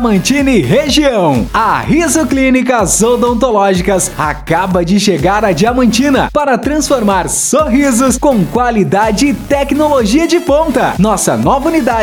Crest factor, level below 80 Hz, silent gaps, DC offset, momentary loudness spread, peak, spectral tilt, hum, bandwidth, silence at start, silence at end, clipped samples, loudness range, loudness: 10 dB; -28 dBFS; none; under 0.1%; 3 LU; 0 dBFS; -4.5 dB/octave; none; 20 kHz; 0 s; 0 s; under 0.1%; 1 LU; -10 LUFS